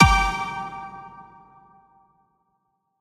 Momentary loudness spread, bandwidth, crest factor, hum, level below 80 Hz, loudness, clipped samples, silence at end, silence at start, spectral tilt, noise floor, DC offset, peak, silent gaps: 25 LU; 15 kHz; 24 dB; none; -34 dBFS; -23 LUFS; under 0.1%; 1.8 s; 0 s; -4.5 dB/octave; -73 dBFS; under 0.1%; 0 dBFS; none